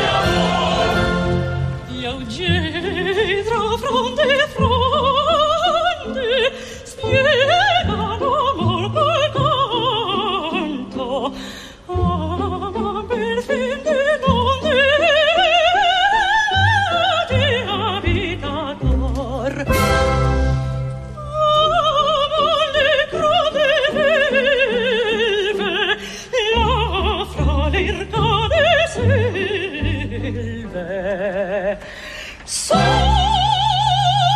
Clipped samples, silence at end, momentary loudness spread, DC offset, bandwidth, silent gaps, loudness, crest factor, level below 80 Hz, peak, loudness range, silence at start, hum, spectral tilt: under 0.1%; 0 s; 10 LU; under 0.1%; 14.5 kHz; none; -17 LUFS; 16 dB; -30 dBFS; -2 dBFS; 6 LU; 0 s; none; -4.5 dB/octave